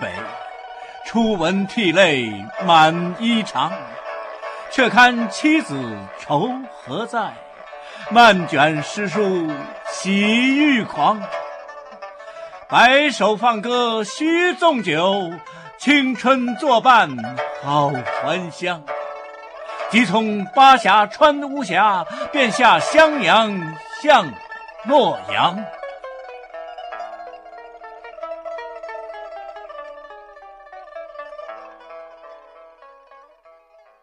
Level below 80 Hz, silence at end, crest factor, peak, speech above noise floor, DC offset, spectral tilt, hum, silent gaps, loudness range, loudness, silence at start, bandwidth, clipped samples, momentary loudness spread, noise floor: -58 dBFS; 1.65 s; 18 dB; -2 dBFS; 35 dB; under 0.1%; -4.5 dB/octave; none; none; 18 LU; -17 LUFS; 0 s; 12.5 kHz; under 0.1%; 23 LU; -52 dBFS